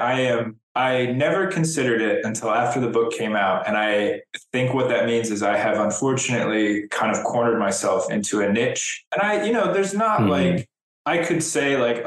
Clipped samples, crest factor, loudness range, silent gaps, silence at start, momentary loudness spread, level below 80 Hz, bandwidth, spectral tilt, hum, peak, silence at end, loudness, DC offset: under 0.1%; 14 dB; 1 LU; 0.63-0.75 s, 9.07-9.11 s, 10.81-11.05 s; 0 s; 3 LU; -62 dBFS; 12.5 kHz; -4.5 dB/octave; none; -8 dBFS; 0 s; -21 LUFS; under 0.1%